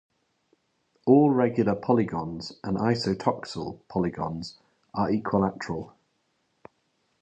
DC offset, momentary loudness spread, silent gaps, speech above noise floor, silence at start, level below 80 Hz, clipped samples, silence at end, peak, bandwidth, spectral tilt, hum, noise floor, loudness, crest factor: under 0.1%; 15 LU; none; 46 dB; 1.05 s; -56 dBFS; under 0.1%; 1.3 s; -6 dBFS; 8.8 kHz; -7.5 dB/octave; none; -73 dBFS; -26 LUFS; 20 dB